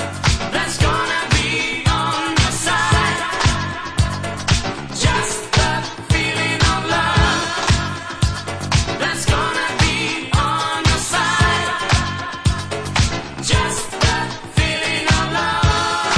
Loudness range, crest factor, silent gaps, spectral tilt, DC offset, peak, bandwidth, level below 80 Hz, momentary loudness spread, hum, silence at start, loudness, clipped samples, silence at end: 2 LU; 16 dB; none; -3.5 dB/octave; under 0.1%; -2 dBFS; 11 kHz; -28 dBFS; 5 LU; none; 0 s; -18 LUFS; under 0.1%; 0 s